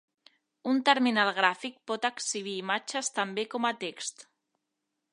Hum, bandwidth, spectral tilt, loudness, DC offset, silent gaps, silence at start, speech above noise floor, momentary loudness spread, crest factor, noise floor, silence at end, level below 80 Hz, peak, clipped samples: none; 11 kHz; -2 dB/octave; -29 LUFS; under 0.1%; none; 0.65 s; 54 dB; 13 LU; 26 dB; -84 dBFS; 0.9 s; -86 dBFS; -6 dBFS; under 0.1%